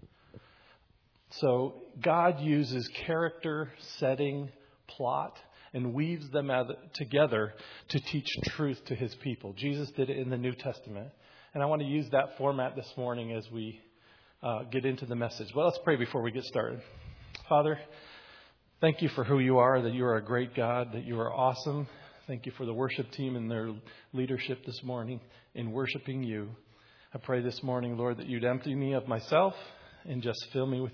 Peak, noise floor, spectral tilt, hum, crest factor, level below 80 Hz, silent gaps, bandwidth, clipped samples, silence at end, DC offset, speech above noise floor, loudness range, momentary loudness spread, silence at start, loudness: -10 dBFS; -67 dBFS; -5 dB/octave; none; 22 dB; -66 dBFS; none; 5.4 kHz; under 0.1%; 0 s; under 0.1%; 35 dB; 7 LU; 16 LU; 0.35 s; -32 LUFS